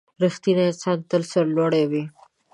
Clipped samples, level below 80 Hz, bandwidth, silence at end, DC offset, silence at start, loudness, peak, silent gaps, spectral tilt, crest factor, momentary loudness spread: under 0.1%; -70 dBFS; 11 kHz; 0.45 s; under 0.1%; 0.2 s; -22 LUFS; -8 dBFS; none; -6.5 dB/octave; 14 dB; 6 LU